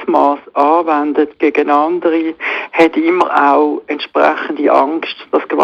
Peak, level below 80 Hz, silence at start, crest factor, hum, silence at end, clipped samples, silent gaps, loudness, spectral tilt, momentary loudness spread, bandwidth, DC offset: 0 dBFS; -62 dBFS; 0 s; 12 dB; none; 0 s; under 0.1%; none; -13 LUFS; -5.5 dB/octave; 6 LU; 8.2 kHz; under 0.1%